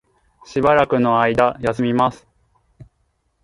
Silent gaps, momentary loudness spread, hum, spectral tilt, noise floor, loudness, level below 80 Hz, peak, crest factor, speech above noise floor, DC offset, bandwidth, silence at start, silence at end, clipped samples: none; 6 LU; none; -7 dB/octave; -67 dBFS; -17 LUFS; -48 dBFS; 0 dBFS; 18 dB; 50 dB; under 0.1%; 11.5 kHz; 0.5 s; 0.6 s; under 0.1%